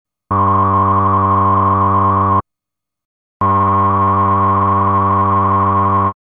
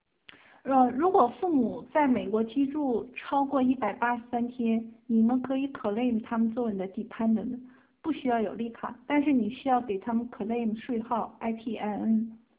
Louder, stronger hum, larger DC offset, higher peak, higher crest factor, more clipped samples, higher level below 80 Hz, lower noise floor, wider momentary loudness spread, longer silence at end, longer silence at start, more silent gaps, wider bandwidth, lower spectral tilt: first, -13 LUFS vs -29 LUFS; neither; neither; first, -4 dBFS vs -10 dBFS; second, 10 dB vs 18 dB; neither; first, -52 dBFS vs -66 dBFS; first, -82 dBFS vs -56 dBFS; second, 3 LU vs 9 LU; about the same, 0.15 s vs 0.2 s; second, 0.3 s vs 0.65 s; first, 3.05-3.40 s vs none; second, 3.6 kHz vs 4 kHz; first, -12.5 dB/octave vs -5.5 dB/octave